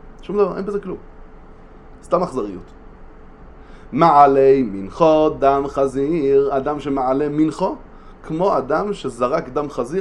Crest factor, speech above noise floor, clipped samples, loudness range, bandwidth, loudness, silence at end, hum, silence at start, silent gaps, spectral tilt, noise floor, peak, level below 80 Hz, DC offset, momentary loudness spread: 18 dB; 23 dB; under 0.1%; 10 LU; 10.5 kHz; -18 LUFS; 0 s; none; 0.05 s; none; -7.5 dB/octave; -41 dBFS; 0 dBFS; -42 dBFS; under 0.1%; 14 LU